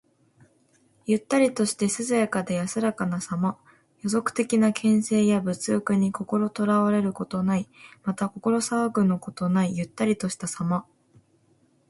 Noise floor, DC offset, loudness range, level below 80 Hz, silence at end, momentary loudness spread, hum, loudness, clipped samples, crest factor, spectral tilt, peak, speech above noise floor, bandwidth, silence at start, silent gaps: -64 dBFS; under 0.1%; 3 LU; -64 dBFS; 1.05 s; 7 LU; none; -25 LUFS; under 0.1%; 18 dB; -5.5 dB/octave; -8 dBFS; 39 dB; 11.5 kHz; 1.05 s; none